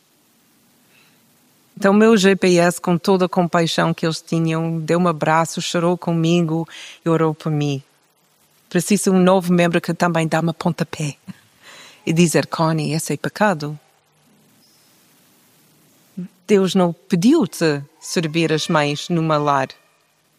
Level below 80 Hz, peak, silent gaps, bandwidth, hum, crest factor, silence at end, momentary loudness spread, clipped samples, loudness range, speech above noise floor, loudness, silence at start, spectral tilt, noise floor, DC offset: -64 dBFS; -2 dBFS; none; 15.5 kHz; none; 18 dB; 0.7 s; 11 LU; under 0.1%; 7 LU; 43 dB; -18 LUFS; 1.8 s; -5.5 dB/octave; -60 dBFS; under 0.1%